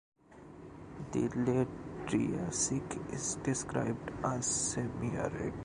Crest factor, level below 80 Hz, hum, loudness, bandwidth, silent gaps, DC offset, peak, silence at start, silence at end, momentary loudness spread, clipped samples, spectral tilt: 18 dB; -56 dBFS; none; -35 LUFS; 11 kHz; none; under 0.1%; -18 dBFS; 0.3 s; 0 s; 15 LU; under 0.1%; -4.5 dB/octave